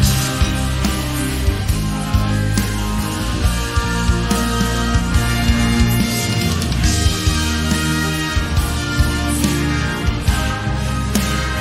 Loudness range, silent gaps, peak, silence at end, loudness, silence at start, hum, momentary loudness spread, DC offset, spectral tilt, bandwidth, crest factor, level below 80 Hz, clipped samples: 2 LU; none; -2 dBFS; 0 s; -18 LUFS; 0 s; none; 4 LU; under 0.1%; -4.5 dB/octave; 16 kHz; 16 dB; -22 dBFS; under 0.1%